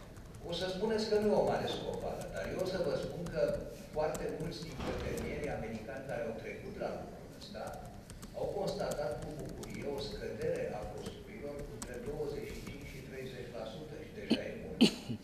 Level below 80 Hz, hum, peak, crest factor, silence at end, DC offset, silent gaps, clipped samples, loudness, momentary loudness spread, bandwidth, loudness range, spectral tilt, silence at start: -54 dBFS; none; -12 dBFS; 26 dB; 0 s; under 0.1%; none; under 0.1%; -38 LUFS; 14 LU; 14.5 kHz; 7 LU; -5.5 dB/octave; 0 s